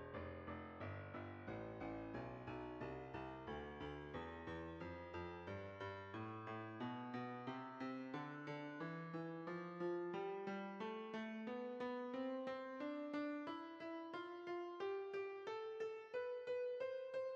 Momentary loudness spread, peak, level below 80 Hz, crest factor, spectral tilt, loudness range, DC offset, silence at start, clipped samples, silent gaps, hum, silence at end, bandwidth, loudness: 5 LU; -34 dBFS; -72 dBFS; 14 dB; -5 dB/octave; 4 LU; under 0.1%; 0 s; under 0.1%; none; none; 0 s; 8 kHz; -49 LUFS